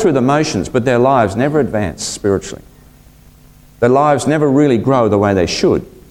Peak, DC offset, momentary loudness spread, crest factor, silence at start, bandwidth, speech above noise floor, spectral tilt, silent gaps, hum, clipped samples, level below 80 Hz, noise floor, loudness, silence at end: 0 dBFS; under 0.1%; 7 LU; 14 dB; 0 s; 16 kHz; 30 dB; -6 dB/octave; none; none; under 0.1%; -40 dBFS; -43 dBFS; -14 LUFS; 0.2 s